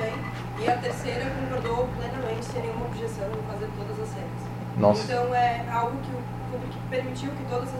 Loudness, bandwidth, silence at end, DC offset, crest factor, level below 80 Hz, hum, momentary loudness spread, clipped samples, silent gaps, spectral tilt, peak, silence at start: -29 LUFS; 16 kHz; 0 s; under 0.1%; 22 dB; -46 dBFS; none; 10 LU; under 0.1%; none; -6.5 dB/octave; -6 dBFS; 0 s